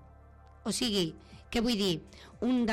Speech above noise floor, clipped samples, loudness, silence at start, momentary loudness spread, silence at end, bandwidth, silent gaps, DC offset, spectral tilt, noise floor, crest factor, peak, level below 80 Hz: 24 dB; under 0.1%; -32 LUFS; 0 s; 12 LU; 0 s; 16 kHz; none; under 0.1%; -4 dB/octave; -55 dBFS; 14 dB; -18 dBFS; -54 dBFS